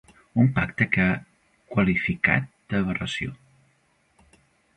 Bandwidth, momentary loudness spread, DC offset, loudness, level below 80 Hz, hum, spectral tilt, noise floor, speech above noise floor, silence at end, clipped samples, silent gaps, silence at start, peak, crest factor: 10.5 kHz; 8 LU; under 0.1%; -24 LUFS; -48 dBFS; none; -7 dB/octave; -66 dBFS; 43 dB; 1.4 s; under 0.1%; none; 0.35 s; -4 dBFS; 22 dB